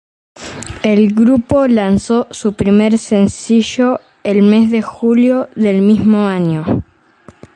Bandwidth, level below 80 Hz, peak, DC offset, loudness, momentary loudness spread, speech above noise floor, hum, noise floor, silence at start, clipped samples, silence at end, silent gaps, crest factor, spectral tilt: 9.6 kHz; -40 dBFS; 0 dBFS; under 0.1%; -13 LUFS; 9 LU; 32 dB; none; -43 dBFS; 0.4 s; under 0.1%; 0.7 s; none; 12 dB; -6.5 dB/octave